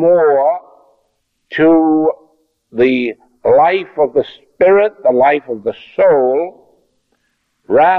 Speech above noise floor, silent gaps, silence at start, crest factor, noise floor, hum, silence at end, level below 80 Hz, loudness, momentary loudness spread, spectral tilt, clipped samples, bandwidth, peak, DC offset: 53 dB; none; 0 s; 12 dB; -65 dBFS; none; 0 s; -56 dBFS; -13 LUFS; 12 LU; -8.5 dB/octave; under 0.1%; 5.2 kHz; -2 dBFS; under 0.1%